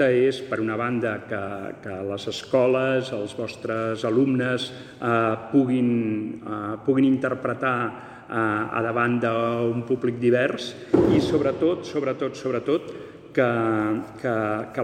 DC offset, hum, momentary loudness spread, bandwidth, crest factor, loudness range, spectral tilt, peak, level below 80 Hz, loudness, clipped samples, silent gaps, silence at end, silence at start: under 0.1%; none; 10 LU; 9.8 kHz; 20 dB; 3 LU; -7 dB/octave; -4 dBFS; -58 dBFS; -24 LUFS; under 0.1%; none; 0 s; 0 s